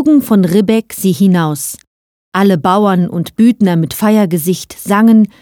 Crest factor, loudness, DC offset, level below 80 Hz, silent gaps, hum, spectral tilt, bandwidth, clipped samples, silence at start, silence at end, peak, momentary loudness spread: 12 dB; -12 LUFS; under 0.1%; -52 dBFS; 1.87-2.32 s; none; -6.5 dB/octave; 18.5 kHz; under 0.1%; 0 s; 0.15 s; 0 dBFS; 9 LU